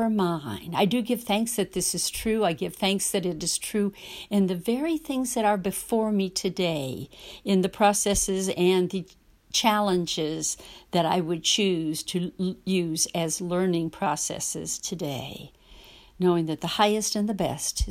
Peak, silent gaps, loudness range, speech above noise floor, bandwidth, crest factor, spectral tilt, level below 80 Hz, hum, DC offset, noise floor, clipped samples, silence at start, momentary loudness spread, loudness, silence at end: -6 dBFS; none; 3 LU; 24 dB; 16 kHz; 20 dB; -4 dB/octave; -48 dBFS; none; under 0.1%; -50 dBFS; under 0.1%; 0 s; 8 LU; -26 LUFS; 0 s